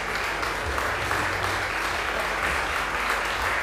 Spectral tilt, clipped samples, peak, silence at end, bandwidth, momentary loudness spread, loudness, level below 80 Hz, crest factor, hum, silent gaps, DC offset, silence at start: -3 dB/octave; under 0.1%; -8 dBFS; 0 s; 16.5 kHz; 2 LU; -25 LUFS; -40 dBFS; 18 dB; none; none; under 0.1%; 0 s